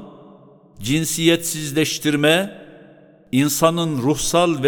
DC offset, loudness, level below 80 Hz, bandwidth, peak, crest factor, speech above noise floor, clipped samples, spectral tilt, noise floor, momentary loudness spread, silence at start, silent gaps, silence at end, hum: under 0.1%; -18 LUFS; -48 dBFS; 19 kHz; 0 dBFS; 20 dB; 29 dB; under 0.1%; -4 dB/octave; -48 dBFS; 6 LU; 0 s; none; 0 s; none